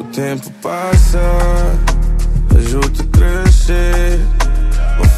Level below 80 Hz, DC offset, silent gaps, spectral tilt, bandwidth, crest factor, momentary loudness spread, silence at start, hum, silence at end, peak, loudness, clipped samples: -12 dBFS; under 0.1%; none; -6 dB/octave; 13.5 kHz; 10 dB; 9 LU; 0 s; none; 0 s; 0 dBFS; -14 LUFS; under 0.1%